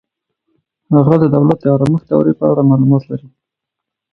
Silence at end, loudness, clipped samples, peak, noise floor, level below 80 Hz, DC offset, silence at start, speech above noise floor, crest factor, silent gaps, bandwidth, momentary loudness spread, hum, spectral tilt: 0.85 s; -12 LUFS; under 0.1%; 0 dBFS; -80 dBFS; -50 dBFS; under 0.1%; 0.9 s; 69 dB; 14 dB; none; 5.4 kHz; 5 LU; none; -11 dB/octave